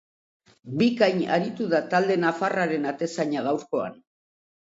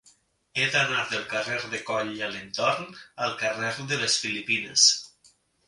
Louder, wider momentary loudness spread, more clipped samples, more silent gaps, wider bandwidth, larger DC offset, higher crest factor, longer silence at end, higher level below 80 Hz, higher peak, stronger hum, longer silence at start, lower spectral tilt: about the same, -25 LUFS vs -25 LUFS; second, 8 LU vs 13 LU; neither; neither; second, 7.8 kHz vs 11.5 kHz; neither; about the same, 20 dB vs 22 dB; first, 0.75 s vs 0.6 s; about the same, -72 dBFS vs -68 dBFS; about the same, -6 dBFS vs -6 dBFS; neither; about the same, 0.65 s vs 0.55 s; first, -6 dB/octave vs -1 dB/octave